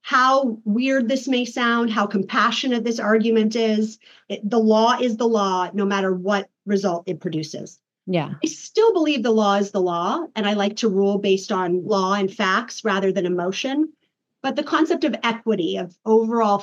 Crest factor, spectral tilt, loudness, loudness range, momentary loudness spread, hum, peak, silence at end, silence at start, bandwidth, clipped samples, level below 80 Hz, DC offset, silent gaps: 16 dB; -5 dB/octave; -21 LUFS; 3 LU; 9 LU; none; -6 dBFS; 0 s; 0.05 s; 8 kHz; under 0.1%; -86 dBFS; under 0.1%; none